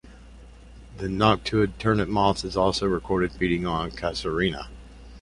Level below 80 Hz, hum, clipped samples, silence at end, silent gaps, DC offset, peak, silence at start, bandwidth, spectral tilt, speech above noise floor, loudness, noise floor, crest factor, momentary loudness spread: -42 dBFS; none; under 0.1%; 0 s; none; under 0.1%; -4 dBFS; 0.05 s; 11.5 kHz; -6 dB/octave; 22 dB; -25 LUFS; -46 dBFS; 22 dB; 8 LU